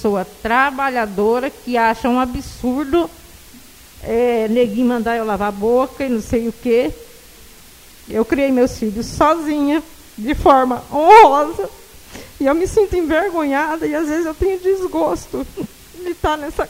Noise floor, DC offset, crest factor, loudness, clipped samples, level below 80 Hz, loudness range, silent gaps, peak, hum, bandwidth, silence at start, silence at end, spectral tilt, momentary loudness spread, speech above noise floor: -42 dBFS; under 0.1%; 16 dB; -16 LUFS; under 0.1%; -38 dBFS; 6 LU; none; 0 dBFS; none; 16 kHz; 0 s; 0 s; -5.5 dB/octave; 13 LU; 26 dB